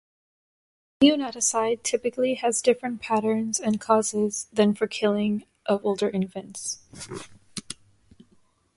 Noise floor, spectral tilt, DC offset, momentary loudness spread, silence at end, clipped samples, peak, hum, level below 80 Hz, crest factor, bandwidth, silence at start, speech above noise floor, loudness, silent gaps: -63 dBFS; -4 dB/octave; under 0.1%; 17 LU; 1.05 s; under 0.1%; -6 dBFS; none; -66 dBFS; 20 dB; 11.5 kHz; 1 s; 39 dB; -24 LUFS; none